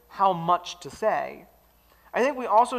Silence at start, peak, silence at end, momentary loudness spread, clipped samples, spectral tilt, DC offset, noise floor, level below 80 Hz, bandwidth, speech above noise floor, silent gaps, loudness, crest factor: 0.1 s; -8 dBFS; 0 s; 11 LU; under 0.1%; -4.5 dB/octave; under 0.1%; -59 dBFS; -64 dBFS; 15 kHz; 35 dB; none; -25 LUFS; 18 dB